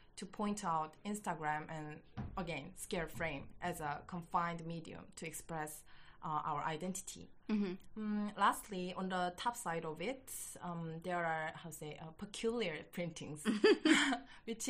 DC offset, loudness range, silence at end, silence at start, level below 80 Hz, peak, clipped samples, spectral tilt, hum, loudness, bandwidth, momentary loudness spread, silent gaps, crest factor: under 0.1%; 6 LU; 0 s; 0 s; -64 dBFS; -18 dBFS; under 0.1%; -4 dB/octave; none; -40 LUFS; 15 kHz; 14 LU; none; 22 dB